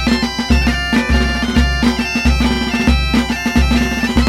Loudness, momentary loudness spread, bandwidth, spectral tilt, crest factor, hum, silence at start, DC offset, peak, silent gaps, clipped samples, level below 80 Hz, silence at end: -15 LUFS; 2 LU; 14 kHz; -5 dB/octave; 14 dB; none; 0 s; under 0.1%; 0 dBFS; none; under 0.1%; -18 dBFS; 0 s